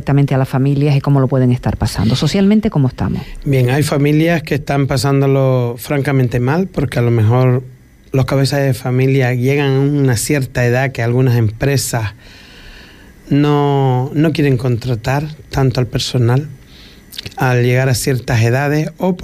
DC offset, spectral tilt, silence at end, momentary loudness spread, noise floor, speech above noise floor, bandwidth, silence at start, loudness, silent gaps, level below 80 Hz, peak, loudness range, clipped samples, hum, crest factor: under 0.1%; -6.5 dB/octave; 0 s; 6 LU; -39 dBFS; 26 dB; 15 kHz; 0 s; -14 LUFS; none; -36 dBFS; -4 dBFS; 2 LU; under 0.1%; none; 10 dB